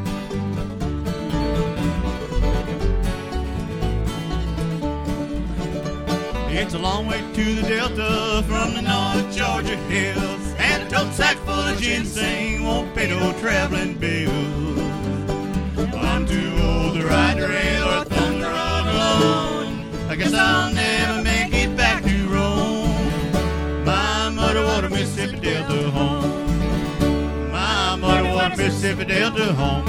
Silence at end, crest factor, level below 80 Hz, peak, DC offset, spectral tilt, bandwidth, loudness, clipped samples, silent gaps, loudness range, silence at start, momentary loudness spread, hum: 0 s; 20 dB; -28 dBFS; -2 dBFS; under 0.1%; -5 dB/octave; 16 kHz; -21 LUFS; under 0.1%; none; 5 LU; 0 s; 8 LU; none